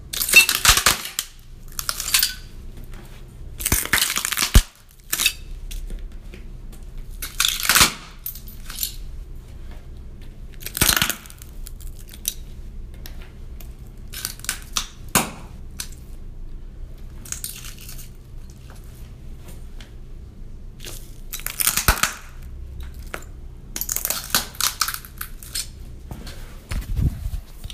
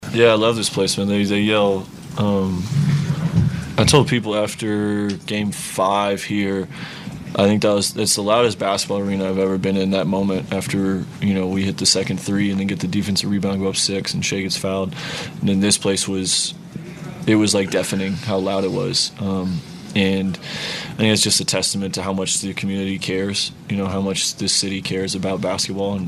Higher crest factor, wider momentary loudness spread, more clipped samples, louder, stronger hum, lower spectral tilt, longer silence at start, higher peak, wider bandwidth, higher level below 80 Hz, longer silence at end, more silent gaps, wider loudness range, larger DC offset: first, 26 dB vs 20 dB; first, 25 LU vs 8 LU; neither; about the same, -20 LUFS vs -19 LUFS; neither; second, -1 dB/octave vs -4 dB/octave; about the same, 0 s vs 0 s; about the same, 0 dBFS vs 0 dBFS; first, 16 kHz vs 13.5 kHz; first, -32 dBFS vs -48 dBFS; about the same, 0 s vs 0 s; neither; first, 15 LU vs 2 LU; neither